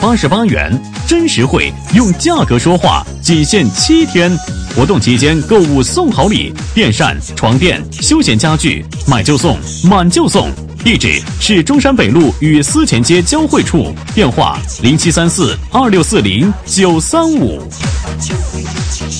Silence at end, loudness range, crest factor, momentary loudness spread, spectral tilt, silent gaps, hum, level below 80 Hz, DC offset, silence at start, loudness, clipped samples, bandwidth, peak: 0 s; 1 LU; 10 dB; 7 LU; -4.5 dB/octave; none; none; -24 dBFS; 0.2%; 0 s; -11 LUFS; 0.2%; 11 kHz; 0 dBFS